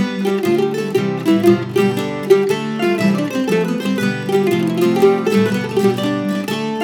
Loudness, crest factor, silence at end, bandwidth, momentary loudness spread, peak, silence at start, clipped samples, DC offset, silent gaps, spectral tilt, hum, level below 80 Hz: -16 LUFS; 16 dB; 0 s; 18.5 kHz; 5 LU; 0 dBFS; 0 s; under 0.1%; under 0.1%; none; -6.5 dB/octave; none; -66 dBFS